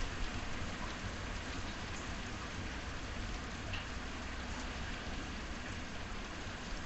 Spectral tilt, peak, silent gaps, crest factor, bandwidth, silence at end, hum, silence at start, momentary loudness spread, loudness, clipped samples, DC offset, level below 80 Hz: -4 dB/octave; -26 dBFS; none; 16 dB; 8.4 kHz; 0 s; none; 0 s; 2 LU; -43 LUFS; under 0.1%; under 0.1%; -46 dBFS